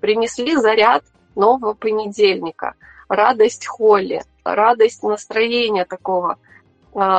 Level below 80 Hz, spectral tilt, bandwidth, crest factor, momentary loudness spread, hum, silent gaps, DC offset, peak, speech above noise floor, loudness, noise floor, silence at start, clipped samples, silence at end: -58 dBFS; -3.5 dB/octave; 8.8 kHz; 16 dB; 11 LU; none; none; under 0.1%; 0 dBFS; 25 dB; -17 LUFS; -41 dBFS; 0.05 s; under 0.1%; 0 s